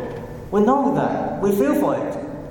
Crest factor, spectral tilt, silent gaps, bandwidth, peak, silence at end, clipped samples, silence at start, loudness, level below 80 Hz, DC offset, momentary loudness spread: 14 dB; -7.5 dB/octave; none; 17.5 kHz; -6 dBFS; 0 s; under 0.1%; 0 s; -20 LUFS; -46 dBFS; under 0.1%; 13 LU